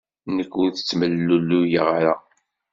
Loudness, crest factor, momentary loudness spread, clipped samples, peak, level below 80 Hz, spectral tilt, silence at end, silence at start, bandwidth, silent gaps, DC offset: -21 LUFS; 18 dB; 8 LU; under 0.1%; -4 dBFS; -62 dBFS; -5 dB/octave; 0.55 s; 0.25 s; 7.6 kHz; none; under 0.1%